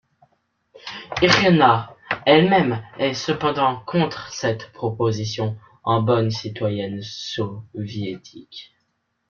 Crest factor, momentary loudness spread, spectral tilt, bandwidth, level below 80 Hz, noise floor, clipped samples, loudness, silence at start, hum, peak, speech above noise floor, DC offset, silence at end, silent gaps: 22 dB; 18 LU; -5.5 dB/octave; 7.2 kHz; -54 dBFS; -71 dBFS; under 0.1%; -21 LUFS; 0.75 s; none; 0 dBFS; 51 dB; under 0.1%; 0.65 s; none